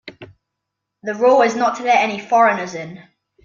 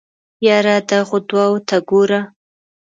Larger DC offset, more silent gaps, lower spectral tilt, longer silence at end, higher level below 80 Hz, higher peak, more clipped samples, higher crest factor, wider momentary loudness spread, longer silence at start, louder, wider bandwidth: neither; neither; about the same, -4 dB/octave vs -5 dB/octave; second, 0.45 s vs 0.6 s; about the same, -66 dBFS vs -64 dBFS; about the same, -2 dBFS vs 0 dBFS; neither; about the same, 16 dB vs 16 dB; first, 17 LU vs 4 LU; second, 0.05 s vs 0.4 s; about the same, -16 LUFS vs -15 LUFS; about the same, 7.4 kHz vs 7.8 kHz